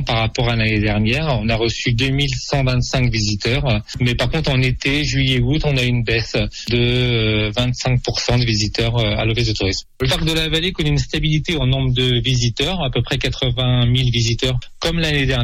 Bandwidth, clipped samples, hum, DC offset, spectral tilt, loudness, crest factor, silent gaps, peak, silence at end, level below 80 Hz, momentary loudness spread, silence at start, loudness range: 14 kHz; under 0.1%; none; under 0.1%; -5 dB/octave; -18 LUFS; 12 dB; none; -6 dBFS; 0 s; -28 dBFS; 3 LU; 0 s; 1 LU